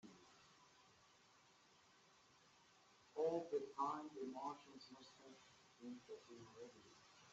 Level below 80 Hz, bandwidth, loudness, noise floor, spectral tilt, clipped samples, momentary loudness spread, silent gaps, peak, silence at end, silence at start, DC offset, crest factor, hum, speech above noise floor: under -90 dBFS; 8 kHz; -49 LUFS; -73 dBFS; -4 dB/octave; under 0.1%; 24 LU; none; -30 dBFS; 0 s; 0.05 s; under 0.1%; 22 dB; none; 21 dB